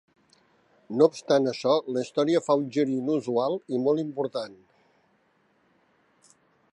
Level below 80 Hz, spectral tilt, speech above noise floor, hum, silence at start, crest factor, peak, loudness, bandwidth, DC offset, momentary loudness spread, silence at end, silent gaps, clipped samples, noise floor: -80 dBFS; -6 dB/octave; 42 dB; none; 0.9 s; 20 dB; -6 dBFS; -26 LUFS; 10.5 kHz; under 0.1%; 8 LU; 2.2 s; none; under 0.1%; -67 dBFS